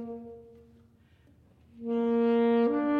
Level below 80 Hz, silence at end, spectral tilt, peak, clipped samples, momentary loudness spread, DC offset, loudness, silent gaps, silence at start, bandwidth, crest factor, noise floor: -66 dBFS; 0 s; -8.5 dB/octave; -16 dBFS; under 0.1%; 19 LU; under 0.1%; -26 LUFS; none; 0 s; 4.9 kHz; 14 dB; -61 dBFS